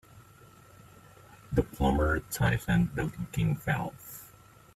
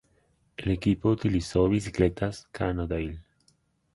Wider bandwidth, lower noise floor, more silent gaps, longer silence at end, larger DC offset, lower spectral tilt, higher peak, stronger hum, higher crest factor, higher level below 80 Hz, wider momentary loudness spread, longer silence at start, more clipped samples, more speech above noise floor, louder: first, 16 kHz vs 11.5 kHz; second, -56 dBFS vs -68 dBFS; neither; second, 0.5 s vs 0.75 s; neither; about the same, -6.5 dB/octave vs -7 dB/octave; second, -12 dBFS vs -8 dBFS; neither; about the same, 20 dB vs 20 dB; about the same, -42 dBFS vs -42 dBFS; about the same, 13 LU vs 11 LU; second, 0.15 s vs 0.6 s; neither; second, 27 dB vs 41 dB; about the same, -30 LUFS vs -28 LUFS